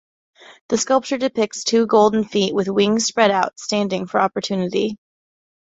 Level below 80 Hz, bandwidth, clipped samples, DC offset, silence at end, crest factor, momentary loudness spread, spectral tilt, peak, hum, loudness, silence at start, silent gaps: -62 dBFS; 8.2 kHz; under 0.1%; under 0.1%; 0.7 s; 18 dB; 7 LU; -4 dB/octave; -2 dBFS; none; -19 LUFS; 0.5 s; 0.61-0.69 s